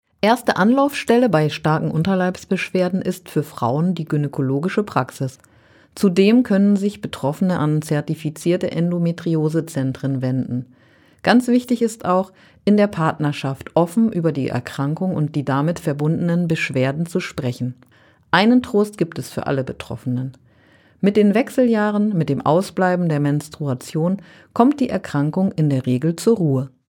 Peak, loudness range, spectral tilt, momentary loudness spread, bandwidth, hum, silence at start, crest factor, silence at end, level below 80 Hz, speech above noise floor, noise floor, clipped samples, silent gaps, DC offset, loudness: 0 dBFS; 3 LU; -7 dB/octave; 9 LU; 17.5 kHz; none; 0.25 s; 18 dB; 0.2 s; -58 dBFS; 34 dB; -53 dBFS; under 0.1%; none; under 0.1%; -19 LUFS